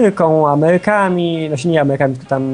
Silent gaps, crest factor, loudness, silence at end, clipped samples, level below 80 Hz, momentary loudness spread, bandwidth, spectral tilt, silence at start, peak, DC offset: none; 14 dB; -14 LUFS; 0 s; under 0.1%; -54 dBFS; 6 LU; 10.5 kHz; -7 dB/octave; 0 s; 0 dBFS; under 0.1%